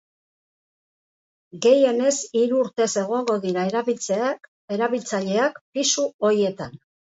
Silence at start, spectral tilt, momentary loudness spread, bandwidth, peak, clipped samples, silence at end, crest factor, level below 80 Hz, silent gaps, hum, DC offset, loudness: 1.55 s; -3.5 dB/octave; 8 LU; 8 kHz; -6 dBFS; under 0.1%; 0.3 s; 18 dB; -68 dBFS; 4.48-4.68 s, 5.61-5.73 s, 6.14-6.19 s; none; under 0.1%; -22 LUFS